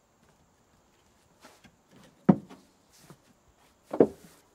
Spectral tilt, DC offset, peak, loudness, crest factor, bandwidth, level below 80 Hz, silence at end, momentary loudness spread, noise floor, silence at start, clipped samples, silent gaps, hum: -9 dB/octave; under 0.1%; -4 dBFS; -27 LUFS; 30 dB; 12.5 kHz; -68 dBFS; 0.45 s; 25 LU; -65 dBFS; 2.3 s; under 0.1%; none; none